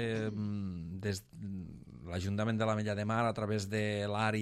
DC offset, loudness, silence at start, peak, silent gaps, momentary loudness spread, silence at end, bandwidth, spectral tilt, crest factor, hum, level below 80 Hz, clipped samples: under 0.1%; -36 LUFS; 0 s; -18 dBFS; none; 11 LU; 0 s; 13.5 kHz; -6 dB/octave; 16 dB; none; -64 dBFS; under 0.1%